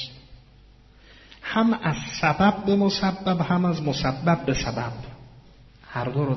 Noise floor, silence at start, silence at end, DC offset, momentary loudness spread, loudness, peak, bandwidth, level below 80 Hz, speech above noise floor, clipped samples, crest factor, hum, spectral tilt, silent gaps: -52 dBFS; 0 s; 0 s; under 0.1%; 14 LU; -24 LUFS; -6 dBFS; 6.2 kHz; -46 dBFS; 29 dB; under 0.1%; 18 dB; none; -5 dB/octave; none